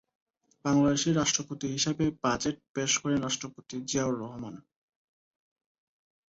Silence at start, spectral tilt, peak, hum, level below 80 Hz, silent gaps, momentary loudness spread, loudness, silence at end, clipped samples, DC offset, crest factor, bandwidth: 0.65 s; -4 dB/octave; -12 dBFS; none; -60 dBFS; 2.69-2.74 s; 13 LU; -29 LUFS; 1.7 s; under 0.1%; under 0.1%; 18 dB; 8 kHz